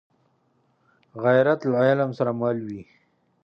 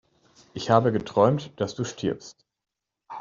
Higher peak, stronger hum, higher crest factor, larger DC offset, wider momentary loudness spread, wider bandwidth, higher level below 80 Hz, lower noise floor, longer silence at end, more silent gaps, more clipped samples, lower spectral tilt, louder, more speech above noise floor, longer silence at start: about the same, -6 dBFS vs -4 dBFS; neither; about the same, 18 dB vs 22 dB; neither; about the same, 17 LU vs 16 LU; second, 6.4 kHz vs 7.6 kHz; second, -70 dBFS vs -62 dBFS; second, -67 dBFS vs -86 dBFS; first, 0.6 s vs 0 s; neither; neither; first, -8.5 dB/octave vs -6 dB/octave; first, -22 LUFS vs -25 LUFS; second, 45 dB vs 62 dB; first, 1.15 s vs 0.55 s